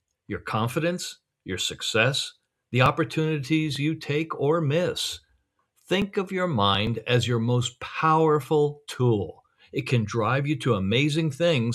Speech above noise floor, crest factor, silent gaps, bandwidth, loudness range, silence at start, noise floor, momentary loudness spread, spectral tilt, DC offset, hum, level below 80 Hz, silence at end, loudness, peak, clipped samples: 45 dB; 22 dB; none; 13.5 kHz; 2 LU; 0.3 s; -70 dBFS; 9 LU; -5.5 dB/octave; under 0.1%; none; -56 dBFS; 0 s; -25 LUFS; -4 dBFS; under 0.1%